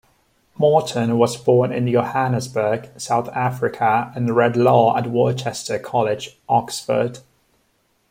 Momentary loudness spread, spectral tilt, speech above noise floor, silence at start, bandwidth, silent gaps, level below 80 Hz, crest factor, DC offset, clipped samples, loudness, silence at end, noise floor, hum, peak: 7 LU; -6 dB/octave; 46 dB; 0.6 s; 16.5 kHz; none; -60 dBFS; 18 dB; under 0.1%; under 0.1%; -19 LUFS; 0.9 s; -64 dBFS; none; -2 dBFS